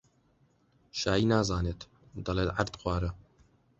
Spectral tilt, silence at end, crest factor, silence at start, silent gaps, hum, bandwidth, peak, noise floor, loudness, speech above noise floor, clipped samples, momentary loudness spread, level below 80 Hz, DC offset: -5.5 dB/octave; 0.6 s; 22 dB; 0.95 s; none; none; 8.2 kHz; -10 dBFS; -68 dBFS; -31 LUFS; 38 dB; under 0.1%; 17 LU; -44 dBFS; under 0.1%